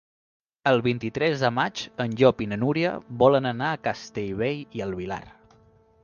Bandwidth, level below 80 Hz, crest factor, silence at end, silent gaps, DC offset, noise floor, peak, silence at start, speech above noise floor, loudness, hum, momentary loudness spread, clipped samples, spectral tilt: 7.2 kHz; -56 dBFS; 22 dB; 0.75 s; none; under 0.1%; -58 dBFS; -4 dBFS; 0.65 s; 34 dB; -25 LUFS; none; 11 LU; under 0.1%; -6.5 dB/octave